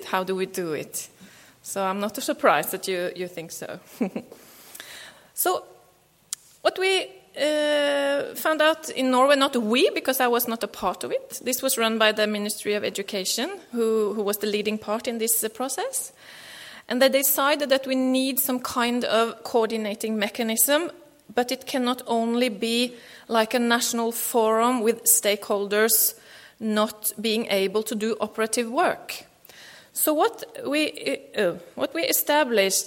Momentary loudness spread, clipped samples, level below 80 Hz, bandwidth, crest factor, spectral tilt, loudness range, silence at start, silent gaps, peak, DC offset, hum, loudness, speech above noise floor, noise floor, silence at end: 14 LU; under 0.1%; -70 dBFS; 17 kHz; 22 dB; -2 dB/octave; 5 LU; 0 s; none; -4 dBFS; under 0.1%; none; -23 LUFS; 35 dB; -59 dBFS; 0 s